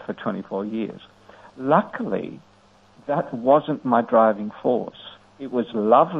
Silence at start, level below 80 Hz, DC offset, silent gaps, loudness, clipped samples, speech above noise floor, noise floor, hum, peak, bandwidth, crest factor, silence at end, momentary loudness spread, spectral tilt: 0 s; -66 dBFS; under 0.1%; none; -22 LUFS; under 0.1%; 32 dB; -54 dBFS; none; -2 dBFS; 6.2 kHz; 20 dB; 0 s; 19 LU; -9 dB/octave